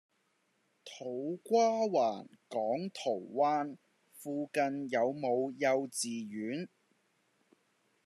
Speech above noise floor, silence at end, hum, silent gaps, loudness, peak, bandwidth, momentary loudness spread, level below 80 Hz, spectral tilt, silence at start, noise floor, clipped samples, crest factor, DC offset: 43 dB; 1.4 s; none; none; -34 LUFS; -18 dBFS; 13.5 kHz; 13 LU; under -90 dBFS; -4.5 dB/octave; 0.85 s; -76 dBFS; under 0.1%; 18 dB; under 0.1%